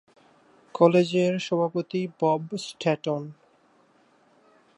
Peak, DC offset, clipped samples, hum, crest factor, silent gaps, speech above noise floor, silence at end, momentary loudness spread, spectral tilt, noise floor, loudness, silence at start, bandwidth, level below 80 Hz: -4 dBFS; under 0.1%; under 0.1%; none; 22 dB; none; 37 dB; 1.45 s; 13 LU; -6.5 dB/octave; -61 dBFS; -25 LUFS; 0.75 s; 11 kHz; -76 dBFS